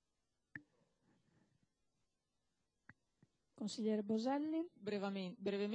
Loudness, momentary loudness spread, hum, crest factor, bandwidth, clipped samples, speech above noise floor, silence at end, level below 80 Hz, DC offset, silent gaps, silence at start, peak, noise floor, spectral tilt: -42 LUFS; 18 LU; none; 18 dB; 9.8 kHz; under 0.1%; 48 dB; 0 s; under -90 dBFS; under 0.1%; none; 0.55 s; -28 dBFS; -88 dBFS; -6 dB/octave